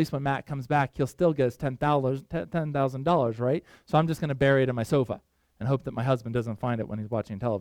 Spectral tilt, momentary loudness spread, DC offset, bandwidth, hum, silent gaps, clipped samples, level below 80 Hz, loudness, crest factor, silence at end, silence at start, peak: -7.5 dB/octave; 7 LU; under 0.1%; 15.5 kHz; none; none; under 0.1%; -54 dBFS; -27 LUFS; 18 dB; 0 s; 0 s; -8 dBFS